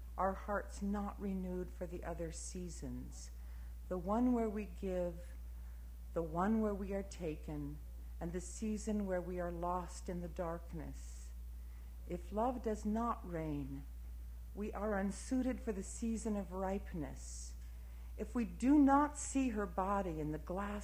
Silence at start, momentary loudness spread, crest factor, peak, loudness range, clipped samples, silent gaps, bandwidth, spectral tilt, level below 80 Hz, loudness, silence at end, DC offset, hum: 0 s; 16 LU; 20 dB; -18 dBFS; 7 LU; under 0.1%; none; 16 kHz; -6.5 dB/octave; -48 dBFS; -40 LUFS; 0 s; under 0.1%; none